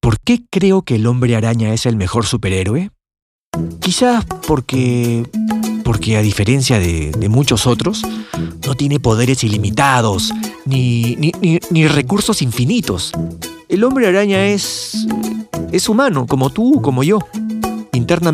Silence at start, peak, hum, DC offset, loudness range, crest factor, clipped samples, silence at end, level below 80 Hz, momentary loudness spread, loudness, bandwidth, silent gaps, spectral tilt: 0.05 s; 0 dBFS; none; under 0.1%; 2 LU; 14 dB; under 0.1%; 0 s; -38 dBFS; 8 LU; -15 LUFS; 16 kHz; 3.22-3.52 s; -5.5 dB/octave